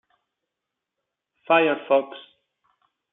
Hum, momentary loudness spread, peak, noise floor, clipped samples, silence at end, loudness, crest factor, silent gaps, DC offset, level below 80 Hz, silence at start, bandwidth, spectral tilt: none; 20 LU; -4 dBFS; -84 dBFS; under 0.1%; 0.95 s; -21 LUFS; 22 dB; none; under 0.1%; -84 dBFS; 1.5 s; 4 kHz; -2 dB/octave